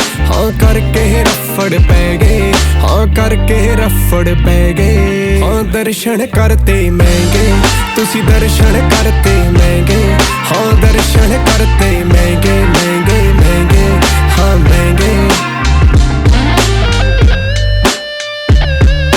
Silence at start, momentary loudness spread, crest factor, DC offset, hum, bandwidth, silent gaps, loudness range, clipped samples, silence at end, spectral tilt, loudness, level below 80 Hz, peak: 0 s; 3 LU; 8 dB; under 0.1%; none; 18 kHz; none; 2 LU; 0.5%; 0 s; -5.5 dB/octave; -10 LUFS; -12 dBFS; 0 dBFS